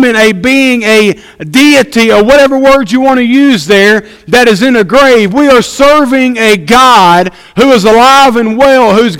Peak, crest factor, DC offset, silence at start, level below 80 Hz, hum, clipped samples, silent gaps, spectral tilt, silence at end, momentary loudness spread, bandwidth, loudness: 0 dBFS; 6 dB; under 0.1%; 0 s; -36 dBFS; none; 7%; none; -4 dB/octave; 0 s; 5 LU; 17 kHz; -5 LUFS